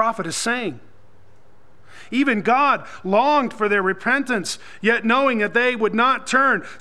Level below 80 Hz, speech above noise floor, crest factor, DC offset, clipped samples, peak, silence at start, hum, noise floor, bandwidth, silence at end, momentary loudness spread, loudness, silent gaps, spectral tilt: -64 dBFS; 35 dB; 18 dB; 1%; under 0.1%; -2 dBFS; 0 s; none; -55 dBFS; 13.5 kHz; 0.05 s; 7 LU; -19 LUFS; none; -4 dB/octave